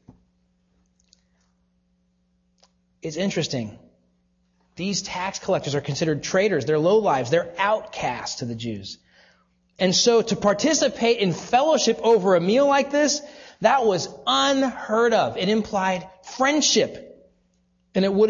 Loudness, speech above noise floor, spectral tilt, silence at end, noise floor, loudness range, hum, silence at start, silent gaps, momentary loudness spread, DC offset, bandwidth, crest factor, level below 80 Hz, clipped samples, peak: -21 LUFS; 46 dB; -4 dB/octave; 0 s; -67 dBFS; 13 LU; none; 3.05 s; none; 12 LU; under 0.1%; 7.6 kHz; 20 dB; -58 dBFS; under 0.1%; -4 dBFS